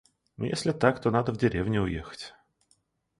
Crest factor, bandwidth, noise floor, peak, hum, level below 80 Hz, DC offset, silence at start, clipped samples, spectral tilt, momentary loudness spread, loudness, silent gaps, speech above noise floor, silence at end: 24 dB; 11.5 kHz; -70 dBFS; -6 dBFS; none; -50 dBFS; under 0.1%; 0.4 s; under 0.1%; -6.5 dB/octave; 16 LU; -28 LUFS; none; 43 dB; 0.9 s